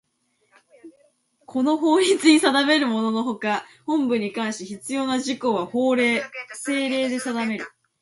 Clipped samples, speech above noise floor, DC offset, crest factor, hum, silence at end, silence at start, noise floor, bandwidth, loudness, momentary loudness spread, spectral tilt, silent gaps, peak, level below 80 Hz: under 0.1%; 47 dB; under 0.1%; 20 dB; none; 0.35 s; 0.85 s; -69 dBFS; 11.5 kHz; -22 LUFS; 12 LU; -3.5 dB/octave; none; -2 dBFS; -72 dBFS